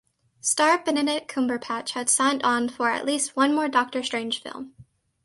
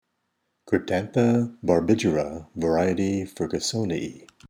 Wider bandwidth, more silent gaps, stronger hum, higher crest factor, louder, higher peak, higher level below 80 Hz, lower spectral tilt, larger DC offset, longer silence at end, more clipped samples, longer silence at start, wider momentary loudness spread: second, 11.5 kHz vs 15.5 kHz; neither; neither; about the same, 18 dB vs 20 dB; about the same, -24 LUFS vs -24 LUFS; about the same, -6 dBFS vs -6 dBFS; second, -70 dBFS vs -52 dBFS; second, -1 dB/octave vs -6 dB/octave; neither; first, 0.4 s vs 0.05 s; neither; second, 0.45 s vs 0.65 s; about the same, 9 LU vs 8 LU